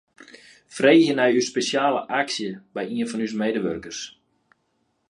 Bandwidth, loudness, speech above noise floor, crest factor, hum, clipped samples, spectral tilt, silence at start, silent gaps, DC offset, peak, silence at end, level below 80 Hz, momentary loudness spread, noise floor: 11 kHz; -22 LUFS; 49 dB; 20 dB; none; under 0.1%; -4 dB/octave; 0.35 s; none; under 0.1%; -4 dBFS; 1 s; -64 dBFS; 16 LU; -71 dBFS